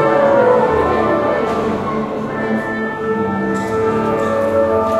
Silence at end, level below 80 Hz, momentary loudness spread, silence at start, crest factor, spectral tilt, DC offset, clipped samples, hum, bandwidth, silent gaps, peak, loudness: 0 s; -44 dBFS; 8 LU; 0 s; 14 dB; -7 dB/octave; under 0.1%; under 0.1%; none; 13 kHz; none; 0 dBFS; -16 LUFS